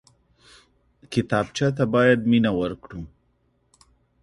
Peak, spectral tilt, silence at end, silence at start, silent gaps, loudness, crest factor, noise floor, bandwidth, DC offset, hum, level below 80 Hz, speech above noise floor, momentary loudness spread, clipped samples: -4 dBFS; -6.5 dB/octave; 1.15 s; 1.1 s; none; -22 LUFS; 20 dB; -67 dBFS; 11.5 kHz; under 0.1%; none; -52 dBFS; 45 dB; 20 LU; under 0.1%